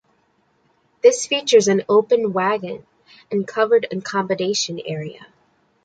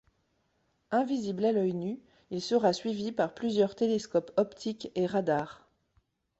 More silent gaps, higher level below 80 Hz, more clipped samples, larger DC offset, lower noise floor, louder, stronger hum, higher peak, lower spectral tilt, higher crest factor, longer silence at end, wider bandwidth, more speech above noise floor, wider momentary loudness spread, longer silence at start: neither; about the same, -68 dBFS vs -70 dBFS; neither; neither; second, -63 dBFS vs -74 dBFS; first, -19 LUFS vs -30 LUFS; neither; first, -2 dBFS vs -12 dBFS; second, -3.5 dB/octave vs -6 dB/octave; about the same, 18 dB vs 20 dB; second, 0.6 s vs 0.85 s; first, 9.2 kHz vs 8.2 kHz; about the same, 45 dB vs 45 dB; first, 14 LU vs 10 LU; first, 1.05 s vs 0.9 s